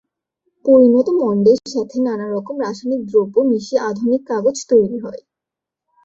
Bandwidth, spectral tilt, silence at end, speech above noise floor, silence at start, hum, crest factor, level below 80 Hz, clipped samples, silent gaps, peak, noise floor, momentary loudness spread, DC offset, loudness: 7.8 kHz; -6 dB/octave; 0.85 s; 69 dB; 0.65 s; none; 16 dB; -60 dBFS; under 0.1%; none; -2 dBFS; -85 dBFS; 12 LU; under 0.1%; -16 LUFS